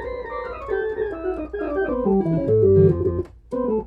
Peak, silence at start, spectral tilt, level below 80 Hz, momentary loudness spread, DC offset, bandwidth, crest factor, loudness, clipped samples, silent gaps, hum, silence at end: -4 dBFS; 0 s; -11 dB/octave; -40 dBFS; 14 LU; under 0.1%; 4.4 kHz; 18 dB; -22 LUFS; under 0.1%; none; none; 0 s